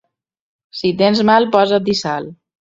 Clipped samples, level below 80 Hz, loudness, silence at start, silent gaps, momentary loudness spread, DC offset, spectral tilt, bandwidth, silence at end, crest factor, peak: under 0.1%; -56 dBFS; -15 LUFS; 0.75 s; none; 14 LU; under 0.1%; -5.5 dB/octave; 7.8 kHz; 0.25 s; 16 dB; 0 dBFS